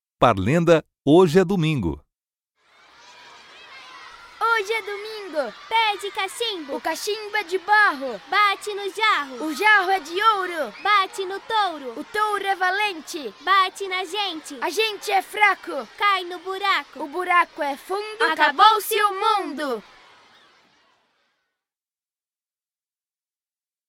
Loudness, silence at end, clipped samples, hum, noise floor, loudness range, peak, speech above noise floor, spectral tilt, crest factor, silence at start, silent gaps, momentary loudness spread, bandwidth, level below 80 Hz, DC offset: -21 LUFS; 4.1 s; under 0.1%; none; under -90 dBFS; 8 LU; 0 dBFS; over 69 dB; -4.5 dB/octave; 22 dB; 0.2 s; none; 13 LU; 16.5 kHz; -54 dBFS; under 0.1%